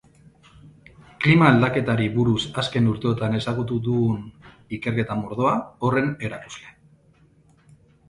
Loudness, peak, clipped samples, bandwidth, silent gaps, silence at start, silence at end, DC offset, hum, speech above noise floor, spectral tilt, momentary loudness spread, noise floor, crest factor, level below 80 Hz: -22 LUFS; -2 dBFS; under 0.1%; 11.5 kHz; none; 0.65 s; 1.4 s; under 0.1%; none; 35 dB; -7 dB/octave; 15 LU; -57 dBFS; 22 dB; -52 dBFS